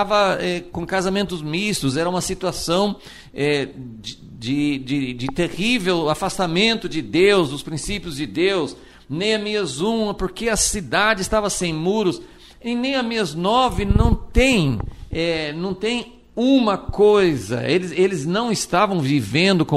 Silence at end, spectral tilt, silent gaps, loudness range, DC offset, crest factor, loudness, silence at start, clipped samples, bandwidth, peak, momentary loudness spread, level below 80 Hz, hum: 0 s; -4.5 dB/octave; none; 4 LU; under 0.1%; 18 dB; -20 LUFS; 0 s; under 0.1%; 14.5 kHz; -2 dBFS; 10 LU; -34 dBFS; none